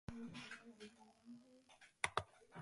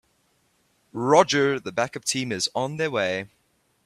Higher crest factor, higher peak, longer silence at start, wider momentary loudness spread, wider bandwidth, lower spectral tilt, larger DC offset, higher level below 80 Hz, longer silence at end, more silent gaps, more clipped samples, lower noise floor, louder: first, 34 dB vs 22 dB; second, -18 dBFS vs -2 dBFS; second, 0.1 s vs 0.95 s; first, 23 LU vs 12 LU; second, 11.5 kHz vs 14 kHz; about the same, -3.5 dB/octave vs -3.5 dB/octave; neither; about the same, -70 dBFS vs -66 dBFS; second, 0 s vs 0.6 s; neither; neither; about the same, -68 dBFS vs -67 dBFS; second, -48 LUFS vs -23 LUFS